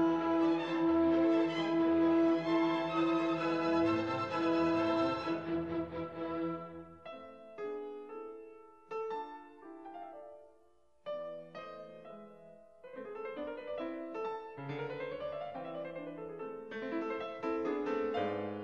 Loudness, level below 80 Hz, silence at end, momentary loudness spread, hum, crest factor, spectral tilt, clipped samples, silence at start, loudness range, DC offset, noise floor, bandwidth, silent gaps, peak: -35 LUFS; -68 dBFS; 0 s; 20 LU; none; 14 dB; -7 dB/octave; under 0.1%; 0 s; 16 LU; under 0.1%; -70 dBFS; 7 kHz; none; -20 dBFS